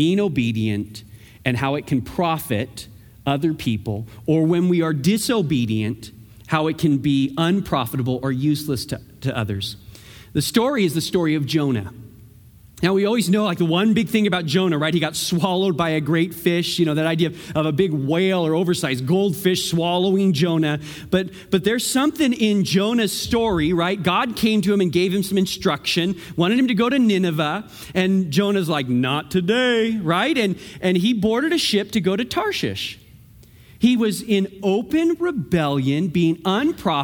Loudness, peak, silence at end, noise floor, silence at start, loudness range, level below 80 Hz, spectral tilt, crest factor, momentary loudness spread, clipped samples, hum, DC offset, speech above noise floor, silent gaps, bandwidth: -20 LUFS; -2 dBFS; 0 s; -47 dBFS; 0 s; 3 LU; -50 dBFS; -5.5 dB/octave; 18 dB; 7 LU; under 0.1%; none; under 0.1%; 27 dB; none; over 20 kHz